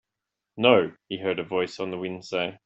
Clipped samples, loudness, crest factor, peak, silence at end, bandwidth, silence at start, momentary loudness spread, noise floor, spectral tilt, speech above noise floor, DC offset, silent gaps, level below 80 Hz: under 0.1%; -25 LUFS; 22 dB; -4 dBFS; 0.1 s; 8 kHz; 0.55 s; 12 LU; -86 dBFS; -5.5 dB/octave; 60 dB; under 0.1%; none; -68 dBFS